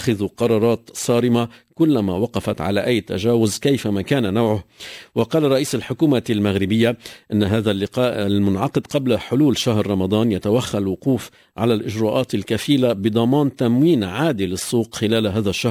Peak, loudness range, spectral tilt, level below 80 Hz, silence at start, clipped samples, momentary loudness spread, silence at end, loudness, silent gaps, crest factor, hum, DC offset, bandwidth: -4 dBFS; 1 LU; -6 dB/octave; -44 dBFS; 0 s; under 0.1%; 5 LU; 0 s; -19 LUFS; none; 14 dB; none; under 0.1%; 16 kHz